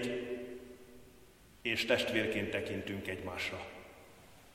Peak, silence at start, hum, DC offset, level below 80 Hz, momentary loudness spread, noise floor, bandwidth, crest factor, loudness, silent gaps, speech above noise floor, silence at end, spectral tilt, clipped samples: -14 dBFS; 0 s; none; under 0.1%; -64 dBFS; 24 LU; -60 dBFS; 16.5 kHz; 24 dB; -36 LUFS; none; 24 dB; 0 s; -4.5 dB/octave; under 0.1%